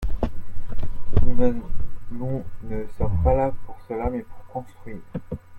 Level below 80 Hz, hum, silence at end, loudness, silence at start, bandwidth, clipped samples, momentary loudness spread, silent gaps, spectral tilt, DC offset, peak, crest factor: -30 dBFS; none; 0 s; -28 LUFS; 0 s; 2.8 kHz; under 0.1%; 15 LU; none; -10 dB/octave; under 0.1%; -2 dBFS; 18 dB